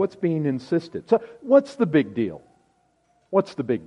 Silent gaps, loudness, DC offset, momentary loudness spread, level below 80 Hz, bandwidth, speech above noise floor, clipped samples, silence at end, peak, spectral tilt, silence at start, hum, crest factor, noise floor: none; -23 LUFS; under 0.1%; 8 LU; -66 dBFS; 10.5 kHz; 43 dB; under 0.1%; 0 s; -4 dBFS; -8 dB/octave; 0 s; none; 18 dB; -65 dBFS